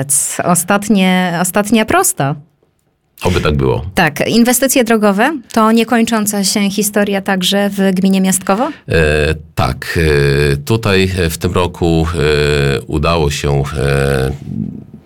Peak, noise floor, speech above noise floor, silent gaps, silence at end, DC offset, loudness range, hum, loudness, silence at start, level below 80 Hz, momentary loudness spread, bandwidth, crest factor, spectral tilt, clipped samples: 0 dBFS; -60 dBFS; 47 dB; none; 0.05 s; under 0.1%; 2 LU; none; -13 LUFS; 0 s; -30 dBFS; 6 LU; 18 kHz; 12 dB; -4.5 dB/octave; under 0.1%